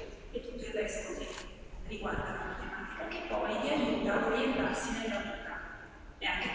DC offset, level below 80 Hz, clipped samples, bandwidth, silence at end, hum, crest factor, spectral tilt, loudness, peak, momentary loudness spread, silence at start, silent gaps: under 0.1%; -50 dBFS; under 0.1%; 8 kHz; 0 s; none; 18 dB; -4 dB/octave; -35 LUFS; -18 dBFS; 14 LU; 0 s; none